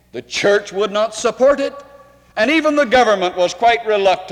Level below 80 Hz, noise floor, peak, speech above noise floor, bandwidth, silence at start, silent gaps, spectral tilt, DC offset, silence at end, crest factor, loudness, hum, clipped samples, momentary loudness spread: -52 dBFS; -45 dBFS; -2 dBFS; 30 dB; 12.5 kHz; 0.15 s; none; -3 dB/octave; under 0.1%; 0 s; 14 dB; -16 LUFS; none; under 0.1%; 7 LU